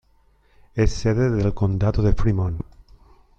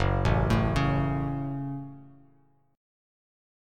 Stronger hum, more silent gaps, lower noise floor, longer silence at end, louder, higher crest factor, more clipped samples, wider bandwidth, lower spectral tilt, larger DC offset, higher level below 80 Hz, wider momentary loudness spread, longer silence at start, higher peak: neither; neither; second, -58 dBFS vs -64 dBFS; second, 0.75 s vs 1.65 s; first, -22 LUFS vs -28 LUFS; about the same, 16 dB vs 20 dB; neither; second, 8 kHz vs 10.5 kHz; about the same, -7.5 dB/octave vs -7.5 dB/octave; neither; first, -30 dBFS vs -38 dBFS; about the same, 11 LU vs 12 LU; first, 0.75 s vs 0 s; first, -4 dBFS vs -10 dBFS